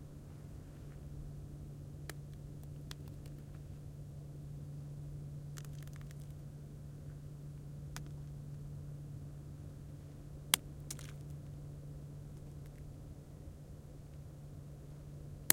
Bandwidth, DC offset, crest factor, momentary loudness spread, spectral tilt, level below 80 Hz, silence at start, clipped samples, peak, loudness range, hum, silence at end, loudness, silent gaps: 16.5 kHz; under 0.1%; 42 dB; 5 LU; -3 dB/octave; -56 dBFS; 0 s; under 0.1%; -2 dBFS; 9 LU; none; 0 s; -47 LUFS; none